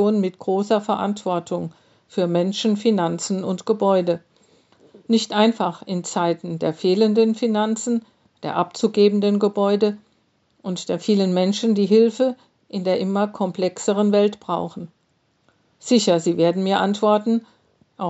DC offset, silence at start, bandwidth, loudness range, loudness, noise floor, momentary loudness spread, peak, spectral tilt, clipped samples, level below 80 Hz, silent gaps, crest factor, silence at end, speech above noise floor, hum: under 0.1%; 0 s; 8.2 kHz; 2 LU; -20 LUFS; -65 dBFS; 11 LU; -2 dBFS; -5.5 dB/octave; under 0.1%; -74 dBFS; none; 18 dB; 0 s; 46 dB; none